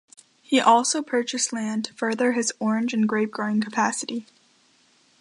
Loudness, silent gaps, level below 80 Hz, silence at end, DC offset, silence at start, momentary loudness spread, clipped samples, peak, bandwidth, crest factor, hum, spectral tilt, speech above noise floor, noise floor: -23 LUFS; none; -76 dBFS; 1 s; under 0.1%; 0.5 s; 10 LU; under 0.1%; -6 dBFS; 11.5 kHz; 20 dB; none; -3 dB/octave; 38 dB; -61 dBFS